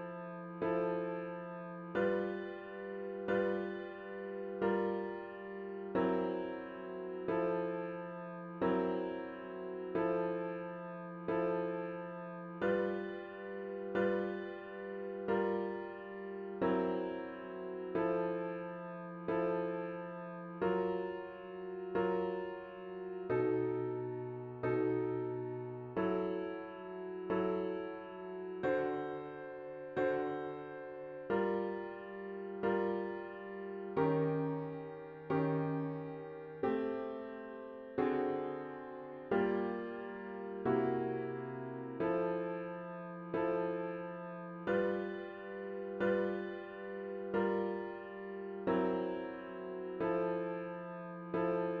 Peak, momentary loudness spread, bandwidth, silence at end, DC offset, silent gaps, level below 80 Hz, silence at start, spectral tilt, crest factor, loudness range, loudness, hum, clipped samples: -20 dBFS; 11 LU; 5 kHz; 0 s; under 0.1%; none; -72 dBFS; 0 s; -6.5 dB/octave; 18 dB; 2 LU; -39 LUFS; none; under 0.1%